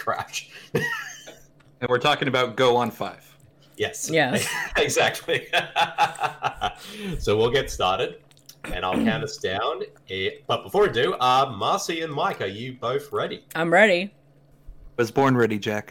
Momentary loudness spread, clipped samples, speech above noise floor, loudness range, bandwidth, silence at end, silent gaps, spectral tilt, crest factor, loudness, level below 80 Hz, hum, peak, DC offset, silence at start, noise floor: 12 LU; under 0.1%; 31 dB; 3 LU; 17.5 kHz; 0 s; none; -4 dB/octave; 20 dB; -23 LUFS; -48 dBFS; none; -4 dBFS; under 0.1%; 0 s; -54 dBFS